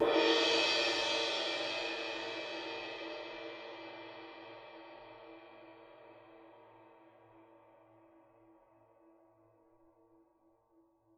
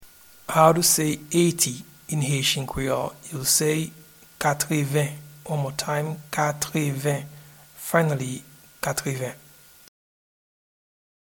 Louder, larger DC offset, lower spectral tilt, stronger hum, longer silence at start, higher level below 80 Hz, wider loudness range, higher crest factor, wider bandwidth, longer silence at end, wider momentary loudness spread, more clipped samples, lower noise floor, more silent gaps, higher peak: second, -34 LUFS vs -24 LUFS; neither; second, -1.5 dB/octave vs -4 dB/octave; neither; about the same, 0 s vs 0 s; second, -76 dBFS vs -54 dBFS; first, 26 LU vs 7 LU; about the same, 22 dB vs 22 dB; second, 11.5 kHz vs 19 kHz; first, 3.75 s vs 1.85 s; first, 27 LU vs 14 LU; neither; first, -71 dBFS vs -44 dBFS; neither; second, -18 dBFS vs -2 dBFS